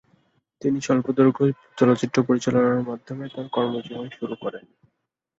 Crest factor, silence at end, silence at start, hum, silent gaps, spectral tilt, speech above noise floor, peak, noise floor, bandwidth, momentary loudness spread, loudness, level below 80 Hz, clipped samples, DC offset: 20 dB; 0.8 s; 0.6 s; none; none; -6.5 dB/octave; 53 dB; -4 dBFS; -76 dBFS; 8 kHz; 14 LU; -23 LUFS; -64 dBFS; under 0.1%; under 0.1%